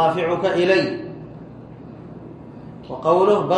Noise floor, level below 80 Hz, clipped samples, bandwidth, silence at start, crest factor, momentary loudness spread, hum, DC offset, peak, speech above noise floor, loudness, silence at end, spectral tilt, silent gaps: -38 dBFS; -56 dBFS; under 0.1%; 9.4 kHz; 0 s; 16 dB; 22 LU; none; under 0.1%; -4 dBFS; 20 dB; -19 LUFS; 0 s; -6.5 dB/octave; none